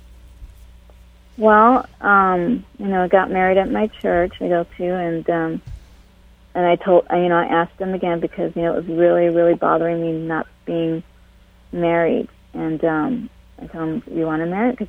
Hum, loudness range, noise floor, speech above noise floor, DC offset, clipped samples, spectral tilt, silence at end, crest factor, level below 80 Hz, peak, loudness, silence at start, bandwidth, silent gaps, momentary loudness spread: none; 6 LU; -49 dBFS; 31 dB; under 0.1%; under 0.1%; -8.5 dB/octave; 0 s; 20 dB; -46 dBFS; 0 dBFS; -19 LUFS; 0.1 s; 4.4 kHz; none; 11 LU